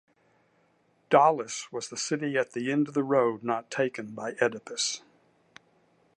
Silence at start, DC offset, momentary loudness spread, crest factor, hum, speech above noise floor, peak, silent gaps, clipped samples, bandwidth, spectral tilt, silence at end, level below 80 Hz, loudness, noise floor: 1.1 s; under 0.1%; 13 LU; 22 dB; none; 40 dB; -6 dBFS; none; under 0.1%; 11.5 kHz; -4 dB/octave; 1.2 s; -82 dBFS; -28 LUFS; -68 dBFS